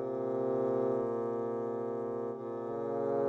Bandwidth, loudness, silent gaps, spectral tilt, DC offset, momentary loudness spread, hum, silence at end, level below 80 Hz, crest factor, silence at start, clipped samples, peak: 6.8 kHz; -35 LUFS; none; -9.5 dB/octave; under 0.1%; 6 LU; none; 0 s; -76 dBFS; 14 dB; 0 s; under 0.1%; -20 dBFS